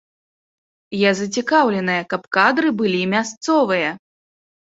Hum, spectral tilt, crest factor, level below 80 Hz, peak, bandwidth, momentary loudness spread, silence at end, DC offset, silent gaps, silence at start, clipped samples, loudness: none; -4.5 dB/octave; 18 dB; -64 dBFS; -2 dBFS; 8 kHz; 6 LU; 0.8 s; under 0.1%; 3.37-3.41 s; 0.9 s; under 0.1%; -18 LUFS